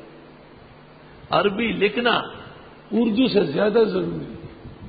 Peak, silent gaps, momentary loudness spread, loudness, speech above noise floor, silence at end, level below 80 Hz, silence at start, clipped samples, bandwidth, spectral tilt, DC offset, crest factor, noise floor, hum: -2 dBFS; none; 19 LU; -21 LUFS; 26 dB; 0 s; -52 dBFS; 0 s; under 0.1%; 5 kHz; -10.5 dB/octave; under 0.1%; 20 dB; -46 dBFS; none